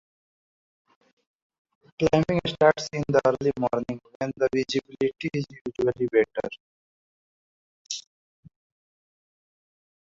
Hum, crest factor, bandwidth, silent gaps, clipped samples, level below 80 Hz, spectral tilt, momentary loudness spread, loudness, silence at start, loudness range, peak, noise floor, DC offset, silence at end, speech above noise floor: none; 24 dB; 7.8 kHz; 4.15-4.20 s, 5.61-5.65 s, 6.60-7.85 s; under 0.1%; -58 dBFS; -5.5 dB/octave; 14 LU; -26 LUFS; 2 s; 17 LU; -4 dBFS; under -90 dBFS; under 0.1%; 2.1 s; over 65 dB